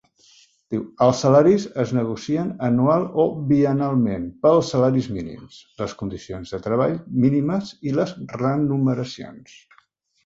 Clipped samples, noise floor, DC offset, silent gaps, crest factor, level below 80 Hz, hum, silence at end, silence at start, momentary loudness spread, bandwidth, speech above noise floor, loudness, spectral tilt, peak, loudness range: under 0.1%; -61 dBFS; under 0.1%; none; 18 dB; -52 dBFS; none; 0.85 s; 0.7 s; 14 LU; 7.8 kHz; 40 dB; -21 LUFS; -7.5 dB/octave; -2 dBFS; 5 LU